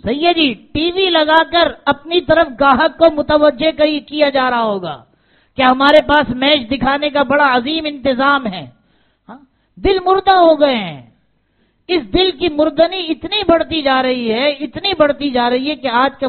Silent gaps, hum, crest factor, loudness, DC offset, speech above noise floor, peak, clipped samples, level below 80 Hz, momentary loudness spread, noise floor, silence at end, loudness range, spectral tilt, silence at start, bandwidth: none; none; 14 dB; -14 LUFS; under 0.1%; 46 dB; 0 dBFS; under 0.1%; -40 dBFS; 8 LU; -60 dBFS; 0 s; 3 LU; -1.5 dB/octave; 0.05 s; 4.6 kHz